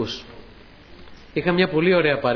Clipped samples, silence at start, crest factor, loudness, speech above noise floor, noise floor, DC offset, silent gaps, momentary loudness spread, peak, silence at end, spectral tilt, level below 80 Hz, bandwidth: under 0.1%; 0 s; 18 dB; -20 LUFS; 25 dB; -45 dBFS; under 0.1%; none; 12 LU; -6 dBFS; 0 s; -7 dB/octave; -48 dBFS; 5.4 kHz